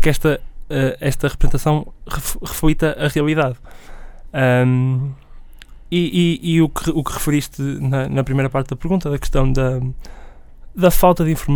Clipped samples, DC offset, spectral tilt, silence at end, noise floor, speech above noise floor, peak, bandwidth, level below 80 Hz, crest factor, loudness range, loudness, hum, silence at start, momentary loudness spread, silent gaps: under 0.1%; under 0.1%; -6 dB/octave; 0 s; -38 dBFS; 21 dB; 0 dBFS; over 20 kHz; -26 dBFS; 18 dB; 2 LU; -19 LUFS; none; 0 s; 10 LU; none